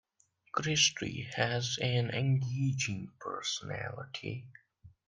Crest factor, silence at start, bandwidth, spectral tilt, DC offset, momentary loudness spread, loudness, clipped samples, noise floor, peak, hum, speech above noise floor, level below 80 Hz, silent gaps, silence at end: 22 dB; 0.55 s; 9.8 kHz; -3.5 dB/octave; under 0.1%; 14 LU; -33 LUFS; under 0.1%; -71 dBFS; -12 dBFS; none; 38 dB; -68 dBFS; none; 0.2 s